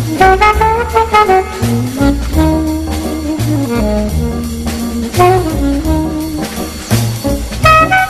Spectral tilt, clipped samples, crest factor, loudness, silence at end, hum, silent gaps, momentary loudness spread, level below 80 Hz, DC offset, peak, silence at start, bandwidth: -5.5 dB/octave; 0.2%; 12 dB; -12 LUFS; 0 s; none; none; 10 LU; -22 dBFS; under 0.1%; 0 dBFS; 0 s; 14.5 kHz